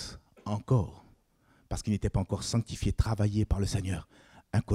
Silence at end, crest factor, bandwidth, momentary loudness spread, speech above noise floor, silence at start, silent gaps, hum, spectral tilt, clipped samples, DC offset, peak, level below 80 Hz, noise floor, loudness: 0 s; 18 dB; 12.5 kHz; 11 LU; 36 dB; 0 s; none; none; -6.5 dB/octave; under 0.1%; under 0.1%; -12 dBFS; -42 dBFS; -66 dBFS; -32 LUFS